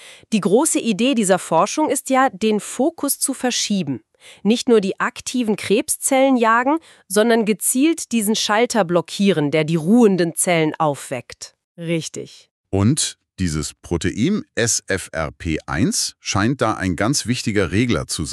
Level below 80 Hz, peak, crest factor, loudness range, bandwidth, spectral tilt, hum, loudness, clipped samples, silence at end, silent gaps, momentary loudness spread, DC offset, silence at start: -46 dBFS; -4 dBFS; 16 dB; 4 LU; 13.5 kHz; -4 dB/octave; none; -19 LUFS; under 0.1%; 0 s; 11.64-11.75 s, 12.51-12.64 s; 9 LU; under 0.1%; 0 s